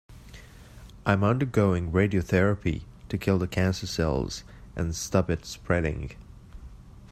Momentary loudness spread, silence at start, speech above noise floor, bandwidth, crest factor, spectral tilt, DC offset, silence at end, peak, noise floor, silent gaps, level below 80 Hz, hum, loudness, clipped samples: 17 LU; 0.1 s; 22 dB; 14.5 kHz; 22 dB; -6 dB/octave; under 0.1%; 0 s; -6 dBFS; -47 dBFS; none; -44 dBFS; none; -27 LUFS; under 0.1%